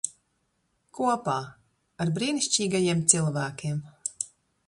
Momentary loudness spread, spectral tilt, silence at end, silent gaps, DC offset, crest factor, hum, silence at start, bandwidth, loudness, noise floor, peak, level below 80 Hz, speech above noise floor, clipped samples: 14 LU; -3.5 dB/octave; 0.4 s; none; under 0.1%; 26 dB; none; 0.05 s; 11.5 kHz; -26 LUFS; -74 dBFS; -2 dBFS; -66 dBFS; 47 dB; under 0.1%